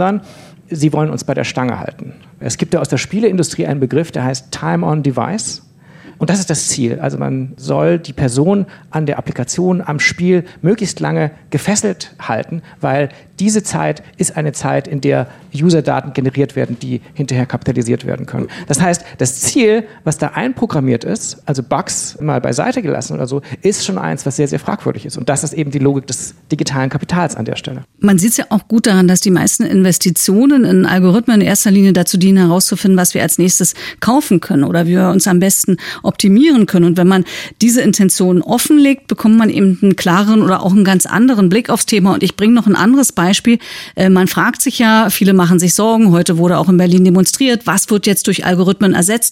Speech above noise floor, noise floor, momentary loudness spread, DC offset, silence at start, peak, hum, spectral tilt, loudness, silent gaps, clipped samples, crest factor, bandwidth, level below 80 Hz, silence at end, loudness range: 27 dB; -39 dBFS; 10 LU; under 0.1%; 0 s; 0 dBFS; none; -5 dB/octave; -13 LUFS; none; under 0.1%; 12 dB; 16.5 kHz; -50 dBFS; 0 s; 7 LU